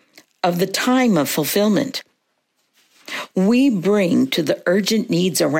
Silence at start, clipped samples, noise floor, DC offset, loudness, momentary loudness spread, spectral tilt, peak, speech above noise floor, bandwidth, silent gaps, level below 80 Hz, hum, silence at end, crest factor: 0.45 s; under 0.1%; -69 dBFS; under 0.1%; -18 LUFS; 9 LU; -5 dB/octave; -6 dBFS; 52 dB; 16.5 kHz; none; -68 dBFS; none; 0 s; 14 dB